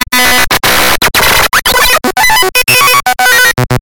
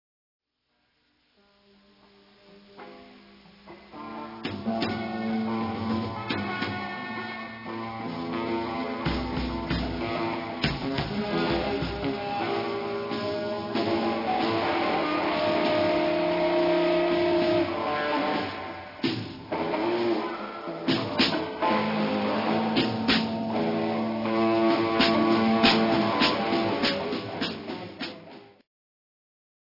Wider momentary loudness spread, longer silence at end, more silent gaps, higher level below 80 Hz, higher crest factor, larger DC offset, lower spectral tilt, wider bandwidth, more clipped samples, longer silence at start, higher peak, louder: second, 2 LU vs 12 LU; second, 0 s vs 1.2 s; neither; first, -28 dBFS vs -50 dBFS; second, 8 dB vs 20 dB; first, 8% vs under 0.1%; second, -1.5 dB/octave vs -6.5 dB/octave; first, over 20 kHz vs 5.8 kHz; first, 1% vs under 0.1%; second, 0 s vs 2.5 s; first, 0 dBFS vs -8 dBFS; first, -6 LUFS vs -27 LUFS